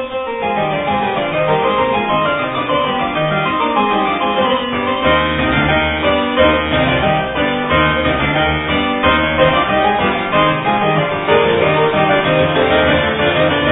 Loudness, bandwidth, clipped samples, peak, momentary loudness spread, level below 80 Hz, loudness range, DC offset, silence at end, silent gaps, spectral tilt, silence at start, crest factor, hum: -14 LUFS; 4 kHz; under 0.1%; 0 dBFS; 4 LU; -34 dBFS; 2 LU; under 0.1%; 0 s; none; -9 dB/octave; 0 s; 14 dB; none